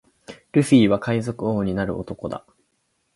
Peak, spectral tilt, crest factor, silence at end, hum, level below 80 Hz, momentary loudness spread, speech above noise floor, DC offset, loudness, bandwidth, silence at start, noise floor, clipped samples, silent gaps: -2 dBFS; -6.5 dB/octave; 20 dB; 0.75 s; none; -50 dBFS; 15 LU; 50 dB; under 0.1%; -21 LUFS; 11.5 kHz; 0.3 s; -70 dBFS; under 0.1%; none